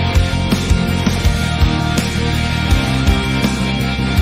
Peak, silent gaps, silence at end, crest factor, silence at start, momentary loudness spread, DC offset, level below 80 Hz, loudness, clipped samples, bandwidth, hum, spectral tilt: -2 dBFS; none; 0 s; 12 dB; 0 s; 2 LU; under 0.1%; -22 dBFS; -16 LUFS; under 0.1%; 16 kHz; none; -5.5 dB/octave